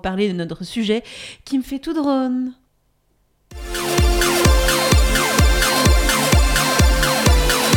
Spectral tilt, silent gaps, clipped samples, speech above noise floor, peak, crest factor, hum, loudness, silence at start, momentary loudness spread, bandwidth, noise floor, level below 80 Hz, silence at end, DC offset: -4 dB/octave; none; under 0.1%; 41 dB; -2 dBFS; 14 dB; none; -17 LUFS; 0.05 s; 11 LU; 18 kHz; -63 dBFS; -22 dBFS; 0 s; under 0.1%